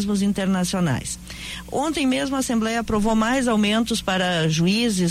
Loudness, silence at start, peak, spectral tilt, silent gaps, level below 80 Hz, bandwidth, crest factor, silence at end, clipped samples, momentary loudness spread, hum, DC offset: -21 LUFS; 0 s; -10 dBFS; -4.5 dB/octave; none; -42 dBFS; 15.5 kHz; 12 dB; 0 s; under 0.1%; 8 LU; none; under 0.1%